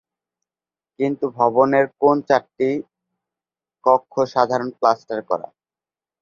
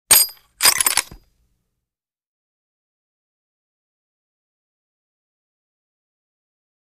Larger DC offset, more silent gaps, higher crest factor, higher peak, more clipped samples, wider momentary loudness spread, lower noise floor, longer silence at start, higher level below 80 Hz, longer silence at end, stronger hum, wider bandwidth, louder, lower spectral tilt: neither; neither; about the same, 20 dB vs 24 dB; about the same, -2 dBFS vs -2 dBFS; neither; about the same, 9 LU vs 8 LU; about the same, under -90 dBFS vs -87 dBFS; first, 1 s vs 0.1 s; second, -66 dBFS vs -56 dBFS; second, 0.8 s vs 5.7 s; neither; second, 7.2 kHz vs 15.5 kHz; second, -20 LUFS vs -15 LUFS; first, -6.5 dB/octave vs 2 dB/octave